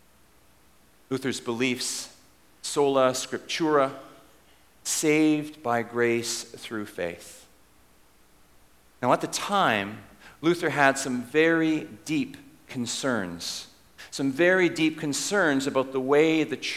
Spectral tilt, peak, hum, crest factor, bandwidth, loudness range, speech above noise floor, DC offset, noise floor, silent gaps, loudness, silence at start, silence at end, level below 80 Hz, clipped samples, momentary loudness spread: -3.5 dB/octave; -4 dBFS; none; 24 dB; 16 kHz; 5 LU; 35 dB; under 0.1%; -60 dBFS; none; -26 LUFS; 1.1 s; 0 s; -66 dBFS; under 0.1%; 14 LU